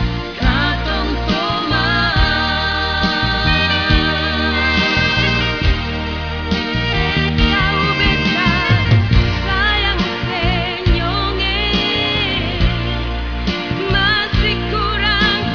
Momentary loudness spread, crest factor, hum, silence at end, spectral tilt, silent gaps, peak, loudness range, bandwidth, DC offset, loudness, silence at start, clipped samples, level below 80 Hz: 6 LU; 16 dB; none; 0 s; -6 dB/octave; none; 0 dBFS; 2 LU; 5.4 kHz; 0.4%; -16 LUFS; 0 s; under 0.1%; -22 dBFS